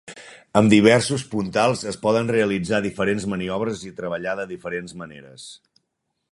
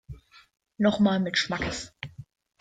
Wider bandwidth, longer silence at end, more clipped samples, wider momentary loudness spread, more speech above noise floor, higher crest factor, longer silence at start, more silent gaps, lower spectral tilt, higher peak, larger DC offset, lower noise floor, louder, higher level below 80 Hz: first, 11.5 kHz vs 9.2 kHz; first, 0.75 s vs 0.35 s; neither; first, 23 LU vs 20 LU; first, 55 dB vs 21 dB; about the same, 22 dB vs 18 dB; about the same, 0.05 s vs 0.1 s; neither; about the same, -5.5 dB/octave vs -5 dB/octave; first, 0 dBFS vs -12 dBFS; neither; first, -76 dBFS vs -47 dBFS; first, -21 LUFS vs -26 LUFS; about the same, -54 dBFS vs -52 dBFS